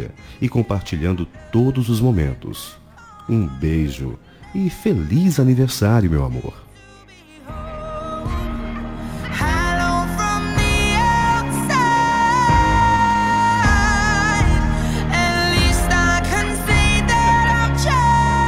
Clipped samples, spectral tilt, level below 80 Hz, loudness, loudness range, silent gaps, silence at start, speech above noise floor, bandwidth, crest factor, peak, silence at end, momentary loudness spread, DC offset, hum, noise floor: under 0.1%; -5 dB/octave; -26 dBFS; -17 LUFS; 7 LU; none; 0 s; 26 dB; 17 kHz; 14 dB; -4 dBFS; 0 s; 14 LU; under 0.1%; none; -44 dBFS